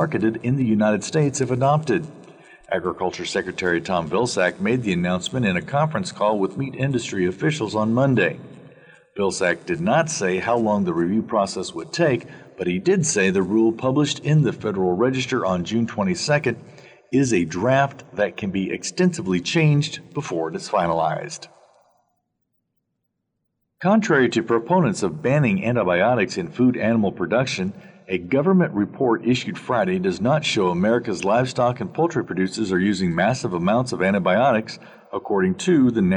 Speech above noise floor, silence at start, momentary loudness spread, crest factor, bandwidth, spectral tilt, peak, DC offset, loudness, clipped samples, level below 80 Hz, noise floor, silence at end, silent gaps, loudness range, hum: 56 dB; 0 s; 7 LU; 16 dB; 10.5 kHz; -5.5 dB/octave; -4 dBFS; under 0.1%; -21 LUFS; under 0.1%; -58 dBFS; -76 dBFS; 0 s; none; 3 LU; none